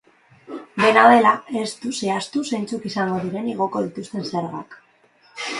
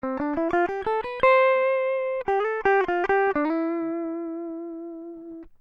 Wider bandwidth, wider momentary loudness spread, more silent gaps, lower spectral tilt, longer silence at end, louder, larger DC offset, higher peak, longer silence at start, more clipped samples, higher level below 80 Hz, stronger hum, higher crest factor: first, 11.5 kHz vs 6.4 kHz; about the same, 19 LU vs 17 LU; neither; second, -4.5 dB/octave vs -6.5 dB/octave; second, 0 s vs 0.15 s; first, -20 LUFS vs -24 LUFS; neither; first, 0 dBFS vs -8 dBFS; first, 0.5 s vs 0.05 s; neither; second, -66 dBFS vs -54 dBFS; neither; first, 22 dB vs 16 dB